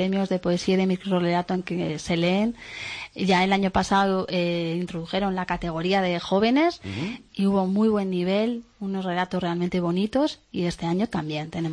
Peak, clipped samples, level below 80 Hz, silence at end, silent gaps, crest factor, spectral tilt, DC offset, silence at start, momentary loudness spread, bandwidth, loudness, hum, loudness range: -10 dBFS; under 0.1%; -50 dBFS; 0 s; none; 14 dB; -6 dB/octave; under 0.1%; 0 s; 8 LU; 10.5 kHz; -25 LUFS; none; 2 LU